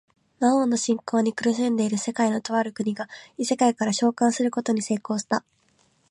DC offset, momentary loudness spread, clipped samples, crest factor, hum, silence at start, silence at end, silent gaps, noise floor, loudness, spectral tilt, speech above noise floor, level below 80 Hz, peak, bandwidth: under 0.1%; 7 LU; under 0.1%; 16 dB; none; 0.4 s; 0.7 s; none; -64 dBFS; -24 LUFS; -4.5 dB/octave; 41 dB; -74 dBFS; -8 dBFS; 11.5 kHz